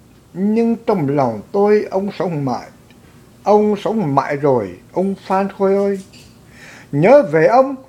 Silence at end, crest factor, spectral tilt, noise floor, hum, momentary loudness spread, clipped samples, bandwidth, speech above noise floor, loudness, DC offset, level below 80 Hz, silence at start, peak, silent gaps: 0.05 s; 16 dB; -8 dB/octave; -45 dBFS; none; 12 LU; under 0.1%; 13 kHz; 29 dB; -16 LUFS; under 0.1%; -56 dBFS; 0.35 s; 0 dBFS; none